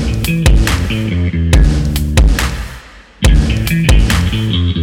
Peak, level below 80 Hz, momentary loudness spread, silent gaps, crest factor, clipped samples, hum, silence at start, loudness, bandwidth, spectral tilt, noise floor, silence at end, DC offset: 0 dBFS; -14 dBFS; 5 LU; none; 10 dB; under 0.1%; none; 0 s; -13 LUFS; 16.5 kHz; -5.5 dB/octave; -34 dBFS; 0 s; under 0.1%